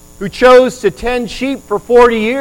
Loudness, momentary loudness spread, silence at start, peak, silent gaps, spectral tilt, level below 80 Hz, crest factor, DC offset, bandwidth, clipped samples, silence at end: -11 LUFS; 13 LU; 0.2 s; 0 dBFS; none; -4.5 dB/octave; -34 dBFS; 10 dB; under 0.1%; 16 kHz; under 0.1%; 0 s